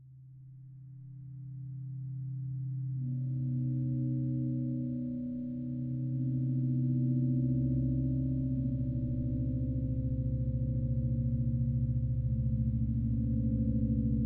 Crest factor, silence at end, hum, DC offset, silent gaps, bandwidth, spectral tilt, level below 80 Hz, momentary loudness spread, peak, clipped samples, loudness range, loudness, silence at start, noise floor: 14 dB; 0 s; none; under 0.1%; none; 0.7 kHz; -15.5 dB/octave; -42 dBFS; 12 LU; -20 dBFS; under 0.1%; 5 LU; -33 LUFS; 0 s; -52 dBFS